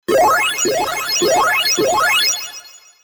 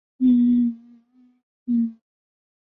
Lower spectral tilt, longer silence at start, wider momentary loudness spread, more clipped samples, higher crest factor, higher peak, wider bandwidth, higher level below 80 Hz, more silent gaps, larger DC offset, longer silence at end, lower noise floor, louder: second, -1 dB/octave vs -11 dB/octave; about the same, 0.1 s vs 0.2 s; second, 8 LU vs 18 LU; neither; about the same, 12 dB vs 14 dB; first, -4 dBFS vs -10 dBFS; first, over 20 kHz vs 3.7 kHz; first, -50 dBFS vs -64 dBFS; second, none vs 1.43-1.66 s; neither; second, 0.25 s vs 0.7 s; second, -38 dBFS vs -56 dBFS; first, -14 LUFS vs -21 LUFS